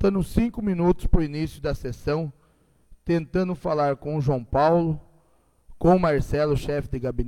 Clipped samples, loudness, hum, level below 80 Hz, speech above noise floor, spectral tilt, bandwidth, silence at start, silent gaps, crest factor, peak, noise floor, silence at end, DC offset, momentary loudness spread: under 0.1%; -24 LUFS; none; -34 dBFS; 39 dB; -8 dB/octave; 14 kHz; 0 s; none; 18 dB; -6 dBFS; -61 dBFS; 0 s; under 0.1%; 9 LU